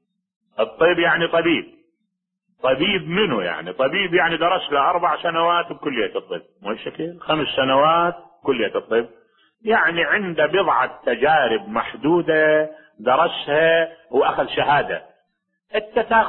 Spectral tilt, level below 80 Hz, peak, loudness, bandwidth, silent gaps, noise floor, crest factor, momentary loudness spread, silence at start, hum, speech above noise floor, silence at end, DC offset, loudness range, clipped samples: -9.5 dB/octave; -56 dBFS; -2 dBFS; -19 LUFS; 4.2 kHz; none; -77 dBFS; 18 dB; 11 LU; 0.6 s; none; 57 dB; 0 s; under 0.1%; 3 LU; under 0.1%